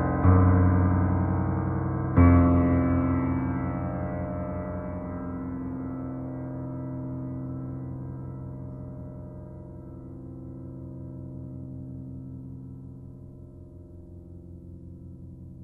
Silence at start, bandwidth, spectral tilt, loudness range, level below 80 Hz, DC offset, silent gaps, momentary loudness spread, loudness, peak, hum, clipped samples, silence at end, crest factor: 0 s; 2.8 kHz; -13 dB/octave; 19 LU; -44 dBFS; under 0.1%; none; 24 LU; -26 LUFS; -6 dBFS; none; under 0.1%; 0 s; 20 dB